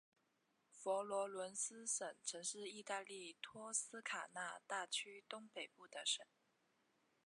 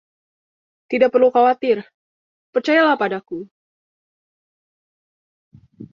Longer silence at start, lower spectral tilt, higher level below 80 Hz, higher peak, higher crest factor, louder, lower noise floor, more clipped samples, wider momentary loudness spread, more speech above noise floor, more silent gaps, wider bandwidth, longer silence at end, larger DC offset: second, 0.75 s vs 0.9 s; second, 0 dB/octave vs -5.5 dB/octave; second, under -90 dBFS vs -68 dBFS; second, -28 dBFS vs -2 dBFS; about the same, 22 dB vs 18 dB; second, -46 LUFS vs -17 LUFS; second, -83 dBFS vs under -90 dBFS; neither; second, 10 LU vs 13 LU; second, 36 dB vs over 73 dB; second, none vs 1.94-2.53 s, 3.51-5.51 s; first, 11.5 kHz vs 7.2 kHz; first, 1 s vs 0.05 s; neither